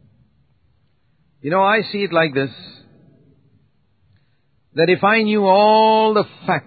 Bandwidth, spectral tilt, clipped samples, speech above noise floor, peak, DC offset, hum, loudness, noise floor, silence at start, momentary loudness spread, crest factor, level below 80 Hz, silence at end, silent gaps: 4.8 kHz; -10.5 dB/octave; under 0.1%; 48 dB; -2 dBFS; under 0.1%; none; -16 LUFS; -63 dBFS; 1.45 s; 14 LU; 18 dB; -66 dBFS; 0.05 s; none